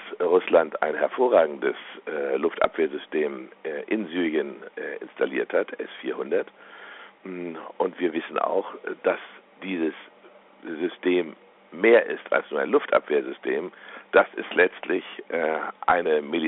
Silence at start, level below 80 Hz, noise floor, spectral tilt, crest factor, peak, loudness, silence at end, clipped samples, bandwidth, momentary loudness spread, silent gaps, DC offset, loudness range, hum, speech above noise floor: 0 s; -68 dBFS; -52 dBFS; -2.5 dB/octave; 20 dB; -6 dBFS; -25 LUFS; 0 s; under 0.1%; 4 kHz; 16 LU; none; under 0.1%; 6 LU; none; 27 dB